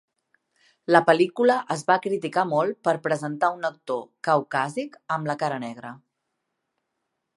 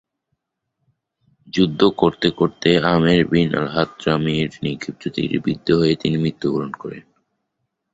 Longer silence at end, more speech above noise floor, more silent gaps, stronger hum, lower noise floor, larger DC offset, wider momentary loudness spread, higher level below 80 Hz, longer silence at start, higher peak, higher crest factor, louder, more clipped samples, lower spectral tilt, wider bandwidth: first, 1.4 s vs 0.95 s; about the same, 56 dB vs 57 dB; neither; neither; first, -80 dBFS vs -76 dBFS; neither; about the same, 13 LU vs 11 LU; second, -78 dBFS vs -48 dBFS; second, 0.9 s vs 1.55 s; about the same, -2 dBFS vs -2 dBFS; about the same, 24 dB vs 20 dB; second, -24 LUFS vs -19 LUFS; neither; second, -5.5 dB/octave vs -7 dB/octave; first, 11.5 kHz vs 8 kHz